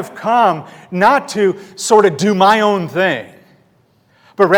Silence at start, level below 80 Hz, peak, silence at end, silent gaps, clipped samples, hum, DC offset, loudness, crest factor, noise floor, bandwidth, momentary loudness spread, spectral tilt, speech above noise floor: 0 s; -60 dBFS; 0 dBFS; 0 s; none; 0.3%; none; under 0.1%; -14 LUFS; 14 dB; -55 dBFS; 18.5 kHz; 12 LU; -4.5 dB/octave; 41 dB